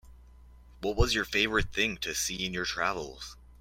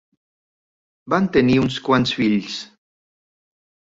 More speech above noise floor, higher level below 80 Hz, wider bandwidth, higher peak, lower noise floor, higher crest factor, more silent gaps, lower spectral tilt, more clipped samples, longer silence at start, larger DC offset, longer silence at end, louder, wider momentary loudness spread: second, 23 dB vs over 72 dB; first, -40 dBFS vs -50 dBFS; first, 16.5 kHz vs 7.8 kHz; second, -10 dBFS vs -4 dBFS; second, -53 dBFS vs under -90 dBFS; about the same, 20 dB vs 18 dB; neither; second, -3 dB/octave vs -6 dB/octave; neither; second, 0.05 s vs 1.05 s; neither; second, 0.05 s vs 1.2 s; second, -29 LUFS vs -19 LUFS; first, 12 LU vs 9 LU